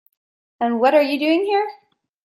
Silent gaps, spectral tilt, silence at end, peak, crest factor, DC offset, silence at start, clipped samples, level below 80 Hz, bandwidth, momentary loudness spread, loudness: none; -5 dB/octave; 0.5 s; -4 dBFS; 16 dB; under 0.1%; 0.6 s; under 0.1%; -74 dBFS; 15 kHz; 9 LU; -19 LUFS